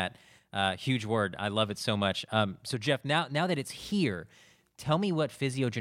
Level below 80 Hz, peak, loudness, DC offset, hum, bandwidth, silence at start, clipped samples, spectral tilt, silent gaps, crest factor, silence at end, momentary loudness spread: -66 dBFS; -12 dBFS; -31 LUFS; under 0.1%; none; 16 kHz; 0 s; under 0.1%; -5 dB/octave; none; 20 dB; 0 s; 5 LU